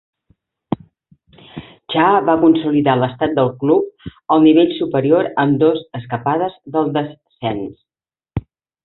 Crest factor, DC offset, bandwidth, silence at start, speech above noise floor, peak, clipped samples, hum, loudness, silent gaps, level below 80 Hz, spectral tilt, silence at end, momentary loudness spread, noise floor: 16 dB; under 0.1%; 4.1 kHz; 0.7 s; over 75 dB; -2 dBFS; under 0.1%; none; -16 LUFS; none; -48 dBFS; -11.5 dB/octave; 0.45 s; 16 LU; under -90 dBFS